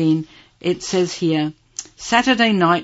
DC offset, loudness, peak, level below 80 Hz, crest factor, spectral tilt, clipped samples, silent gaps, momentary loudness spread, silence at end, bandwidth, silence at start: under 0.1%; -19 LUFS; 0 dBFS; -54 dBFS; 18 dB; -4.5 dB/octave; under 0.1%; none; 17 LU; 0 s; 8 kHz; 0 s